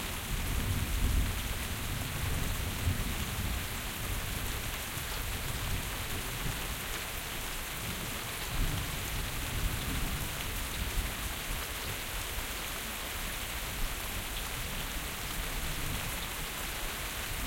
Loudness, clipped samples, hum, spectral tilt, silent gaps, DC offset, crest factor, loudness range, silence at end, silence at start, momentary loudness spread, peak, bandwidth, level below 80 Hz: -35 LUFS; under 0.1%; none; -3 dB/octave; none; under 0.1%; 16 dB; 2 LU; 0 s; 0 s; 3 LU; -18 dBFS; 17 kHz; -40 dBFS